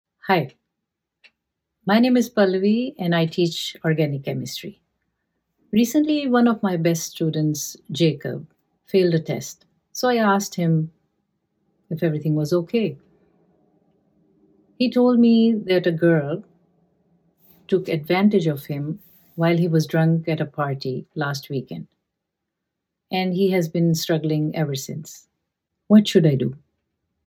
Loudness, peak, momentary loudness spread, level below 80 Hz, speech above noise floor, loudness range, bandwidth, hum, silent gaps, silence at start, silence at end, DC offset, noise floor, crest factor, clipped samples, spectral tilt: -21 LUFS; -2 dBFS; 13 LU; -66 dBFS; 61 dB; 5 LU; 17.5 kHz; none; none; 0.25 s; 0.7 s; under 0.1%; -81 dBFS; 20 dB; under 0.1%; -6 dB/octave